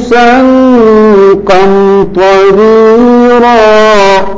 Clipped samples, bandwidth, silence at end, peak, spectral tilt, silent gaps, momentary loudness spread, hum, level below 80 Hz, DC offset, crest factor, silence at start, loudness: 7%; 8 kHz; 0 s; 0 dBFS; -6 dB/octave; none; 2 LU; none; -32 dBFS; under 0.1%; 4 dB; 0 s; -4 LUFS